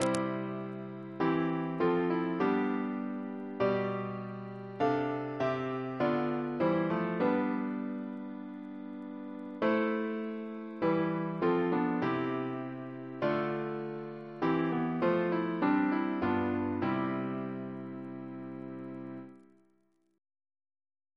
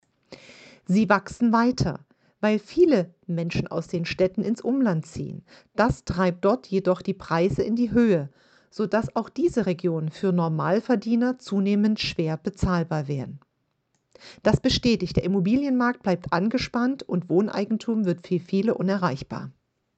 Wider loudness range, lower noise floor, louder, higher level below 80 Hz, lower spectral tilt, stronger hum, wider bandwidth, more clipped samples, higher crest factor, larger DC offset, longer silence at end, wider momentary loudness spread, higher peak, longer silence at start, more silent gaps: first, 5 LU vs 2 LU; about the same, -73 dBFS vs -73 dBFS; second, -33 LUFS vs -24 LUFS; second, -72 dBFS vs -48 dBFS; about the same, -7 dB/octave vs -7 dB/octave; neither; first, 11 kHz vs 8.6 kHz; neither; about the same, 22 dB vs 20 dB; neither; first, 1.8 s vs 0.45 s; first, 13 LU vs 9 LU; second, -10 dBFS vs -4 dBFS; second, 0 s vs 0.3 s; neither